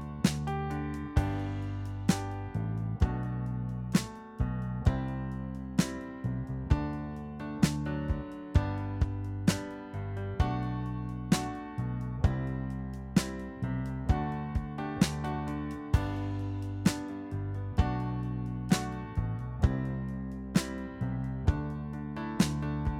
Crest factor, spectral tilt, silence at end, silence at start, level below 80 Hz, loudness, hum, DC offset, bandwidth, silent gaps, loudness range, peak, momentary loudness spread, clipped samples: 22 dB; -6 dB/octave; 0 s; 0 s; -40 dBFS; -33 LUFS; none; under 0.1%; 16.5 kHz; none; 1 LU; -10 dBFS; 7 LU; under 0.1%